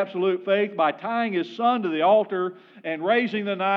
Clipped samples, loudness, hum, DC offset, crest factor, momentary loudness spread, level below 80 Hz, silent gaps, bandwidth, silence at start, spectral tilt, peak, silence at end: under 0.1%; -23 LUFS; none; under 0.1%; 14 dB; 9 LU; under -90 dBFS; none; 6.2 kHz; 0 s; -7.5 dB/octave; -8 dBFS; 0 s